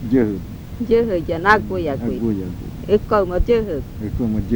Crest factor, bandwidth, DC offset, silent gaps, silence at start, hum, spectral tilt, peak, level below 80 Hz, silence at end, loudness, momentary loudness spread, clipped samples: 20 dB; over 20 kHz; under 0.1%; none; 0 s; none; -7.5 dB/octave; 0 dBFS; -32 dBFS; 0 s; -20 LUFS; 13 LU; under 0.1%